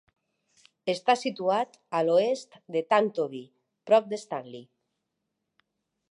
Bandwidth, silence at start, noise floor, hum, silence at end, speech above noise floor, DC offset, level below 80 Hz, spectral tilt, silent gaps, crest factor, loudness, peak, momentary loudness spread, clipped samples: 11.5 kHz; 0.85 s; -82 dBFS; none; 1.5 s; 56 dB; under 0.1%; -86 dBFS; -4.5 dB/octave; none; 20 dB; -27 LUFS; -10 dBFS; 13 LU; under 0.1%